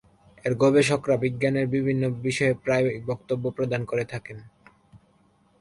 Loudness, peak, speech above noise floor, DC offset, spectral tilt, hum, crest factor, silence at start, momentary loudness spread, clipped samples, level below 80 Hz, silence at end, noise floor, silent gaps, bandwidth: -25 LUFS; -8 dBFS; 38 dB; under 0.1%; -6 dB/octave; none; 18 dB; 0.45 s; 12 LU; under 0.1%; -58 dBFS; 0.65 s; -62 dBFS; none; 11.5 kHz